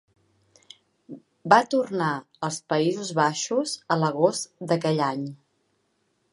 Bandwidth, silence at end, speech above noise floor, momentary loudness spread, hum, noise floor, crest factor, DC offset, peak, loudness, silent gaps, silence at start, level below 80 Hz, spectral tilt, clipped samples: 11.5 kHz; 0.95 s; 47 dB; 16 LU; none; -71 dBFS; 24 dB; under 0.1%; -2 dBFS; -24 LUFS; none; 1.1 s; -76 dBFS; -4.5 dB/octave; under 0.1%